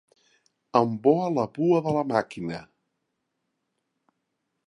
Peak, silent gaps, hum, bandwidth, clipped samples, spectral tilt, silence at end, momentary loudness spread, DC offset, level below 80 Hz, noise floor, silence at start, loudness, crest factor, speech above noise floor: -6 dBFS; none; none; 11 kHz; under 0.1%; -8 dB/octave; 2 s; 12 LU; under 0.1%; -68 dBFS; -79 dBFS; 0.75 s; -25 LUFS; 22 dB; 55 dB